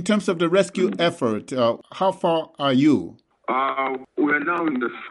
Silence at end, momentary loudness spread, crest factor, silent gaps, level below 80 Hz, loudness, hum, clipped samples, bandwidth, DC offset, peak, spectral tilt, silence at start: 0 s; 7 LU; 16 dB; none; -68 dBFS; -22 LUFS; none; under 0.1%; 11.5 kHz; under 0.1%; -6 dBFS; -5.5 dB/octave; 0 s